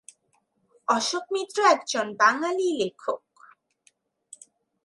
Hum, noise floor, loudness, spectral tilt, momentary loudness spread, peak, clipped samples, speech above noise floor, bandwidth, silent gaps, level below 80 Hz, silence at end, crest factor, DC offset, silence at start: none; -71 dBFS; -24 LUFS; -2 dB/octave; 12 LU; -6 dBFS; under 0.1%; 46 dB; 11.5 kHz; none; -78 dBFS; 1.7 s; 22 dB; under 0.1%; 0.9 s